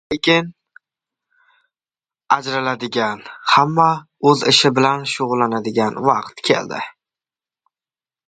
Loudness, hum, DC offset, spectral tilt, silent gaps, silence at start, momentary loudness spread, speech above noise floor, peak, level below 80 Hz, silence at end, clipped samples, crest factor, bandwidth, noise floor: -17 LUFS; none; under 0.1%; -4 dB/octave; none; 0.1 s; 10 LU; over 73 dB; 0 dBFS; -60 dBFS; 1.4 s; under 0.1%; 20 dB; 9.4 kHz; under -90 dBFS